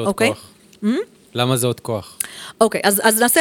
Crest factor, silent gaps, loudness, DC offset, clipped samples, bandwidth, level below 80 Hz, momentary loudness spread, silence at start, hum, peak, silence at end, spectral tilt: 18 dB; none; -19 LUFS; under 0.1%; under 0.1%; 19.5 kHz; -58 dBFS; 13 LU; 0 s; none; 0 dBFS; 0 s; -3.5 dB/octave